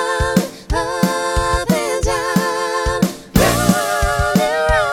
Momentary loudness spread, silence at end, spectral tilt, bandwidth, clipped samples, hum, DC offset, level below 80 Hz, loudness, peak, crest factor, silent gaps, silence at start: 4 LU; 0 s; -4.5 dB/octave; over 20 kHz; under 0.1%; none; under 0.1%; -26 dBFS; -17 LUFS; 0 dBFS; 16 dB; none; 0 s